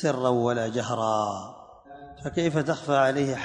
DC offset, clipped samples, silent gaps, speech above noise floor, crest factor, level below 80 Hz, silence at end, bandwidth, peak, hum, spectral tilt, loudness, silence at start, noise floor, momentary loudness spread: under 0.1%; under 0.1%; none; 21 dB; 18 dB; -58 dBFS; 0 s; 10.5 kHz; -8 dBFS; none; -5.5 dB/octave; -26 LUFS; 0 s; -46 dBFS; 16 LU